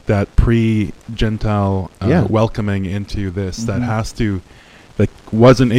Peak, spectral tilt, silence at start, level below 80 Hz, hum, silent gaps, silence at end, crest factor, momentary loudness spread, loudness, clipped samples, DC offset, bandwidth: 0 dBFS; -7.5 dB/octave; 0.05 s; -28 dBFS; none; none; 0 s; 16 dB; 9 LU; -17 LUFS; under 0.1%; under 0.1%; 11 kHz